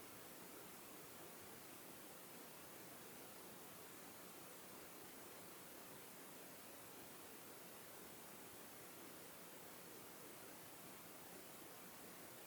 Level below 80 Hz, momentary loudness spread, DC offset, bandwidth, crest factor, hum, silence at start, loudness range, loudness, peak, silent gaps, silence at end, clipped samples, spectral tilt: -86 dBFS; 0 LU; under 0.1%; over 20 kHz; 14 dB; none; 0 s; 0 LU; -56 LUFS; -44 dBFS; none; 0 s; under 0.1%; -2.5 dB/octave